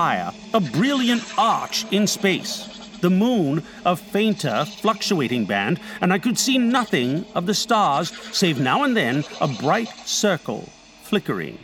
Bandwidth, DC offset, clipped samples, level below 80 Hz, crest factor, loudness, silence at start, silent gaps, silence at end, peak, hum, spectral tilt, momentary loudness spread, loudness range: 18.5 kHz; under 0.1%; under 0.1%; -60 dBFS; 18 dB; -21 LUFS; 0 s; none; 0 s; -4 dBFS; none; -4 dB/octave; 6 LU; 2 LU